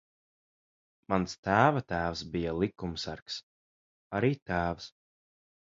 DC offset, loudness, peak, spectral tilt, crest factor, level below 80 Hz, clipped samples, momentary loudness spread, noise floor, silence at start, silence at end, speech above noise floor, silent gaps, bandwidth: under 0.1%; -31 LUFS; -8 dBFS; -6 dB/octave; 26 dB; -54 dBFS; under 0.1%; 15 LU; under -90 dBFS; 1.1 s; 0.8 s; over 60 dB; 1.38-1.43 s, 3.22-3.26 s, 3.43-4.10 s, 4.42-4.46 s; 7.8 kHz